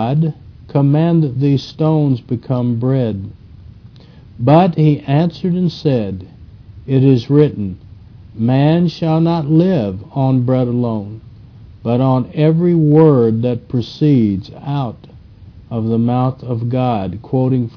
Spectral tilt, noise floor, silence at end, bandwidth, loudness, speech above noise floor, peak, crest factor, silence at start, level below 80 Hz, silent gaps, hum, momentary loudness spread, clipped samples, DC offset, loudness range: -10 dB/octave; -40 dBFS; 0.1 s; 5.4 kHz; -15 LUFS; 26 dB; 0 dBFS; 14 dB; 0 s; -46 dBFS; none; none; 12 LU; under 0.1%; under 0.1%; 4 LU